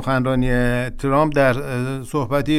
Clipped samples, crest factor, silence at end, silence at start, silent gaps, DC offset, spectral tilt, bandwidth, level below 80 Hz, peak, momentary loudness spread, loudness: under 0.1%; 14 dB; 0 s; 0 s; none; under 0.1%; -7 dB/octave; 15 kHz; -30 dBFS; -4 dBFS; 7 LU; -20 LUFS